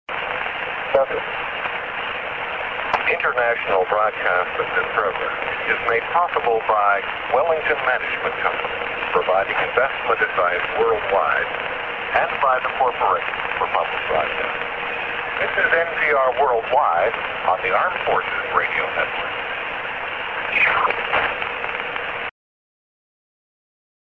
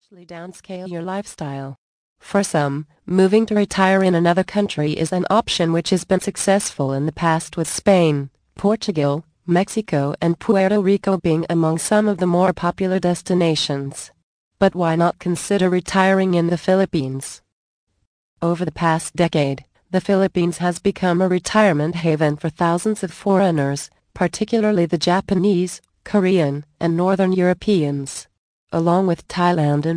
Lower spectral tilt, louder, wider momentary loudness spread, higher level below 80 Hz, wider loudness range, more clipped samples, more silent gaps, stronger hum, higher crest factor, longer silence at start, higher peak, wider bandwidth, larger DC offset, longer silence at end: about the same, -5 dB/octave vs -6 dB/octave; about the same, -20 LUFS vs -19 LUFS; second, 7 LU vs 11 LU; about the same, -52 dBFS vs -52 dBFS; about the same, 2 LU vs 3 LU; neither; second, none vs 1.78-2.16 s, 14.23-14.51 s, 17.52-17.87 s, 18.07-18.36 s, 28.38-28.67 s; neither; about the same, 18 dB vs 16 dB; about the same, 0.1 s vs 0.2 s; about the same, -2 dBFS vs -2 dBFS; second, 7 kHz vs 10.5 kHz; neither; first, 1.7 s vs 0 s